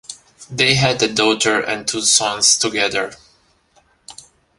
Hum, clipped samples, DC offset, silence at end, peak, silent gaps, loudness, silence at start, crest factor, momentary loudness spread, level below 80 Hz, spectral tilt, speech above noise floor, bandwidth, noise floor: none; under 0.1%; under 0.1%; 0.45 s; 0 dBFS; none; -15 LUFS; 0.1 s; 18 dB; 11 LU; -52 dBFS; -2 dB/octave; 40 dB; 11.5 kHz; -57 dBFS